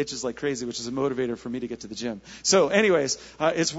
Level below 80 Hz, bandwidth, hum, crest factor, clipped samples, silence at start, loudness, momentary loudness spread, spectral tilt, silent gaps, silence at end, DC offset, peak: -58 dBFS; 8 kHz; none; 20 dB; under 0.1%; 0 s; -25 LUFS; 13 LU; -3 dB/octave; none; 0 s; under 0.1%; -6 dBFS